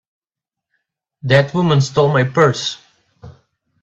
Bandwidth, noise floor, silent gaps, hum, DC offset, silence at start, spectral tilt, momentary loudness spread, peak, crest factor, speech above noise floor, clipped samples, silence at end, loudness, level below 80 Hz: 8 kHz; -86 dBFS; none; none; under 0.1%; 1.25 s; -6 dB/octave; 12 LU; 0 dBFS; 18 dB; 71 dB; under 0.1%; 0.5 s; -15 LUFS; -52 dBFS